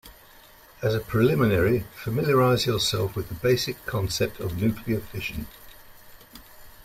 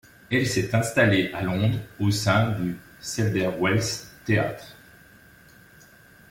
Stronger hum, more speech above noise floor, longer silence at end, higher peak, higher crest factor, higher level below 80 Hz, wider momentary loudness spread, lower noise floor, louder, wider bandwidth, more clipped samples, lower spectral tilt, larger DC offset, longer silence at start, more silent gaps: neither; about the same, 27 dB vs 28 dB; second, 0 s vs 1.55 s; about the same, -8 dBFS vs -6 dBFS; about the same, 18 dB vs 18 dB; first, -48 dBFS vs -54 dBFS; about the same, 10 LU vs 11 LU; about the same, -51 dBFS vs -52 dBFS; about the same, -25 LUFS vs -24 LUFS; about the same, 16 kHz vs 16.5 kHz; neither; about the same, -5.5 dB/octave vs -5.5 dB/octave; neither; second, 0.05 s vs 0.3 s; neither